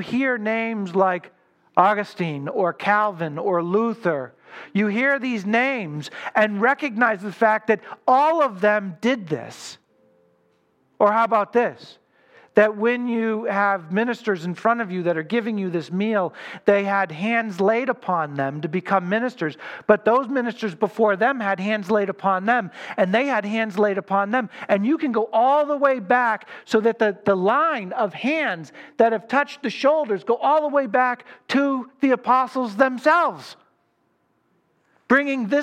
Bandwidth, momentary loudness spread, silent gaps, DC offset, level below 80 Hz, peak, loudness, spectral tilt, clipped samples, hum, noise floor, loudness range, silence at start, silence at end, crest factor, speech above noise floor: 12 kHz; 8 LU; none; under 0.1%; -76 dBFS; 0 dBFS; -21 LUFS; -6.5 dB/octave; under 0.1%; none; -67 dBFS; 3 LU; 0 s; 0 s; 20 dB; 46 dB